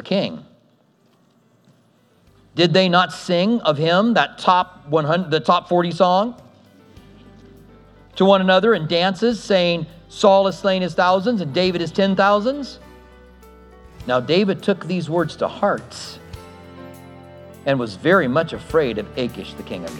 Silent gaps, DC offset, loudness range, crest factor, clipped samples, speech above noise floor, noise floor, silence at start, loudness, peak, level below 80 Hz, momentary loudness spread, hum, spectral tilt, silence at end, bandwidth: none; under 0.1%; 5 LU; 20 dB; under 0.1%; 40 dB; -58 dBFS; 0.05 s; -18 LUFS; 0 dBFS; -52 dBFS; 18 LU; none; -6 dB/octave; 0 s; 12.5 kHz